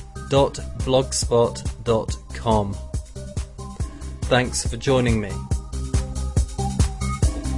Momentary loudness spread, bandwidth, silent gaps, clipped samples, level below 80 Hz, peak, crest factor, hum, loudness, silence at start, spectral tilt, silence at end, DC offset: 12 LU; 11.5 kHz; none; under 0.1%; -30 dBFS; -4 dBFS; 18 dB; none; -23 LUFS; 0 s; -5 dB/octave; 0 s; under 0.1%